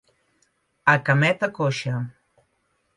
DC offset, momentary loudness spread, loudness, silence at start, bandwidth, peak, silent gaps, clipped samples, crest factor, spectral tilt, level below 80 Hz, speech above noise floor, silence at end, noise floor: under 0.1%; 12 LU; -22 LUFS; 0.85 s; 11 kHz; -4 dBFS; none; under 0.1%; 22 dB; -6 dB/octave; -66 dBFS; 49 dB; 0.85 s; -70 dBFS